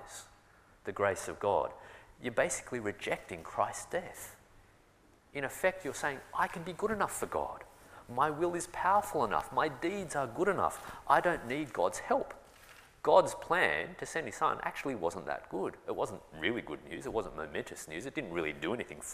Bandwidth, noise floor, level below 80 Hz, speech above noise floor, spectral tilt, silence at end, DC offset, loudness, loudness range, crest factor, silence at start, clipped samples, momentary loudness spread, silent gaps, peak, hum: 15.5 kHz; -64 dBFS; -62 dBFS; 30 dB; -4 dB/octave; 0 s; under 0.1%; -34 LUFS; 6 LU; 24 dB; 0 s; under 0.1%; 13 LU; none; -10 dBFS; none